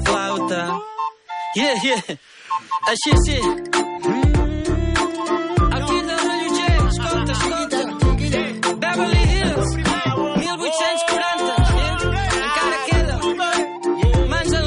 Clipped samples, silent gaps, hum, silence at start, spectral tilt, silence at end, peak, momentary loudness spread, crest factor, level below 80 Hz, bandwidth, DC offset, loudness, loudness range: under 0.1%; none; none; 0 s; -5 dB/octave; 0 s; -6 dBFS; 5 LU; 14 dB; -24 dBFS; 11 kHz; under 0.1%; -20 LUFS; 1 LU